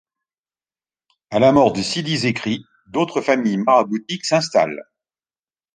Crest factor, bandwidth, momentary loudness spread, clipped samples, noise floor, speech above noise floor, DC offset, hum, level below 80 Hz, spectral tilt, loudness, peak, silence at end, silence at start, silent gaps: 18 dB; 9.8 kHz; 10 LU; under 0.1%; under -90 dBFS; over 72 dB; under 0.1%; none; -56 dBFS; -5 dB/octave; -18 LUFS; -2 dBFS; 0.95 s; 1.3 s; none